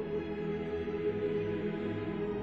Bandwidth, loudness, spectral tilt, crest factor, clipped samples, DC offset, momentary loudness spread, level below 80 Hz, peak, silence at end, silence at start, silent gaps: 6 kHz; -35 LUFS; -9 dB/octave; 12 dB; under 0.1%; under 0.1%; 3 LU; -56 dBFS; -24 dBFS; 0 s; 0 s; none